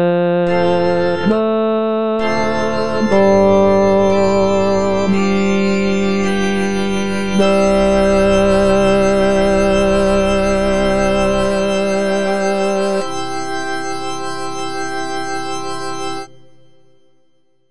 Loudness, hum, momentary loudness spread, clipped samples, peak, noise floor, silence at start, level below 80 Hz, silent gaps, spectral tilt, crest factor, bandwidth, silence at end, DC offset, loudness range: -15 LUFS; none; 10 LU; under 0.1%; -2 dBFS; -61 dBFS; 0 s; -34 dBFS; none; -5.5 dB/octave; 14 dB; 10 kHz; 0 s; 5%; 9 LU